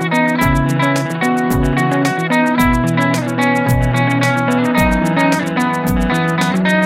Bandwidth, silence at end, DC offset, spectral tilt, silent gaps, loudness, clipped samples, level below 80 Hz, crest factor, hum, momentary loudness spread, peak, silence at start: 16.5 kHz; 0 s; under 0.1%; -6 dB/octave; none; -15 LUFS; under 0.1%; -28 dBFS; 12 dB; none; 2 LU; -2 dBFS; 0 s